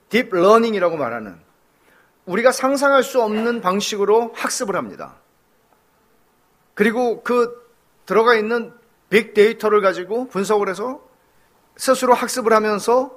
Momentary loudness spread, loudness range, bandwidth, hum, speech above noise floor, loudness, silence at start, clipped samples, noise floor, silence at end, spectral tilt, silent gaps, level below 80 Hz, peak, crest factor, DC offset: 11 LU; 5 LU; 15.5 kHz; none; 42 dB; -18 LUFS; 0.1 s; under 0.1%; -60 dBFS; 0 s; -4 dB/octave; none; -66 dBFS; 0 dBFS; 20 dB; under 0.1%